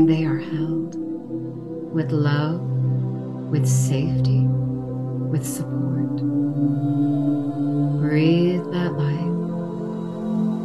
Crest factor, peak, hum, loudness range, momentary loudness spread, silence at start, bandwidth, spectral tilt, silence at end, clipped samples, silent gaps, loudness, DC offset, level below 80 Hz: 16 dB; -6 dBFS; none; 2 LU; 9 LU; 0 s; 12.5 kHz; -7.5 dB/octave; 0 s; under 0.1%; none; -23 LUFS; 0.2%; -54 dBFS